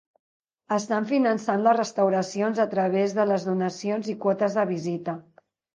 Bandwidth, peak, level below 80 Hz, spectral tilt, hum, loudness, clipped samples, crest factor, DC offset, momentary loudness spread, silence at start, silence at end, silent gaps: 9.8 kHz; -8 dBFS; -76 dBFS; -6 dB/octave; none; -25 LUFS; under 0.1%; 18 dB; under 0.1%; 7 LU; 0.7 s; 0.55 s; none